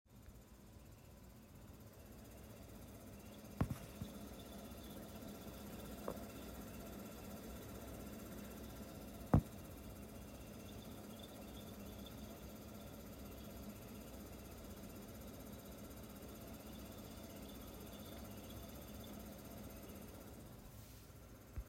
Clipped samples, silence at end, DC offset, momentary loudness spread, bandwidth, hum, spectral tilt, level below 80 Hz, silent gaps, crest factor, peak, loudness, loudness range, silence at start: under 0.1%; 0 s; under 0.1%; 9 LU; 16 kHz; none; -6 dB/octave; -58 dBFS; none; 30 dB; -20 dBFS; -51 LUFS; 8 LU; 0.05 s